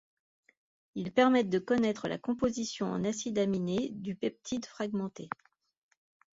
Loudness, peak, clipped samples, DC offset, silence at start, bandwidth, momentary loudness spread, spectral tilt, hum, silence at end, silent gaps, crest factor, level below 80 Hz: -32 LUFS; -12 dBFS; under 0.1%; under 0.1%; 0.95 s; 7.8 kHz; 13 LU; -5.5 dB/octave; none; 1.05 s; none; 20 dB; -66 dBFS